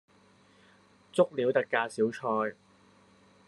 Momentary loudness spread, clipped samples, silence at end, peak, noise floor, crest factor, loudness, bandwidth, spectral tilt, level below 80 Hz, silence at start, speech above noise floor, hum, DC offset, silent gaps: 6 LU; under 0.1%; 0.95 s; -10 dBFS; -62 dBFS; 22 dB; -30 LUFS; 11.5 kHz; -5.5 dB/octave; -82 dBFS; 1.15 s; 33 dB; none; under 0.1%; none